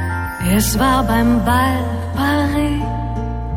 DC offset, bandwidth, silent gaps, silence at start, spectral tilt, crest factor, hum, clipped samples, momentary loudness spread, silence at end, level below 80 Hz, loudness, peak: under 0.1%; 17 kHz; none; 0 s; -5.5 dB/octave; 12 dB; none; under 0.1%; 8 LU; 0 s; -26 dBFS; -17 LUFS; -4 dBFS